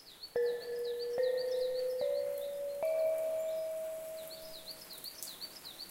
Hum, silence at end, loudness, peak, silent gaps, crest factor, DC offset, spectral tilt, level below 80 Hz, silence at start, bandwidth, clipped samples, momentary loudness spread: none; 0 s; -37 LUFS; -18 dBFS; none; 20 dB; under 0.1%; -1.5 dB/octave; -74 dBFS; 0 s; 17 kHz; under 0.1%; 12 LU